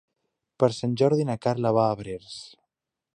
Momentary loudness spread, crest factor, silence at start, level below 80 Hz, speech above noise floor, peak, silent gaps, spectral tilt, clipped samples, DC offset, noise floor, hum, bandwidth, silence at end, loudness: 14 LU; 22 dB; 0.6 s; -62 dBFS; 58 dB; -6 dBFS; none; -7 dB/octave; under 0.1%; under 0.1%; -83 dBFS; none; 10.5 kHz; 0.65 s; -24 LUFS